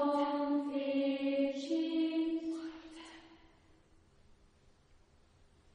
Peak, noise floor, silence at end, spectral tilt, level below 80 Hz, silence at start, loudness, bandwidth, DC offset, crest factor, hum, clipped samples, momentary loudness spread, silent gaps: -22 dBFS; -66 dBFS; 2.4 s; -5 dB/octave; -70 dBFS; 0 s; -35 LUFS; 9.6 kHz; under 0.1%; 16 dB; none; under 0.1%; 18 LU; none